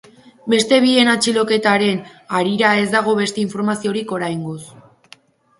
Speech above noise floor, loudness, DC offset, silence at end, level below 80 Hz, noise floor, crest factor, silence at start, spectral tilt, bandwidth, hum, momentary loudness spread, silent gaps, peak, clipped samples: 32 dB; -17 LUFS; under 0.1%; 0.8 s; -62 dBFS; -49 dBFS; 18 dB; 0.45 s; -4 dB/octave; 11.5 kHz; none; 12 LU; none; 0 dBFS; under 0.1%